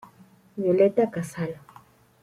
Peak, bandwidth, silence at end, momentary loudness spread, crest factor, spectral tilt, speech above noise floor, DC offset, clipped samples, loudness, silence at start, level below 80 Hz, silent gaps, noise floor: -8 dBFS; 14.5 kHz; 0.7 s; 19 LU; 18 dB; -7.5 dB/octave; 32 dB; under 0.1%; under 0.1%; -24 LUFS; 0.55 s; -68 dBFS; none; -55 dBFS